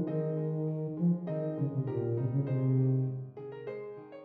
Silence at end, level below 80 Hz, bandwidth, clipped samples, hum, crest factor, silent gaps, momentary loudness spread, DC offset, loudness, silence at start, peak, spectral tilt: 0 s; -70 dBFS; 3.1 kHz; under 0.1%; none; 14 dB; none; 13 LU; under 0.1%; -33 LUFS; 0 s; -18 dBFS; -13 dB/octave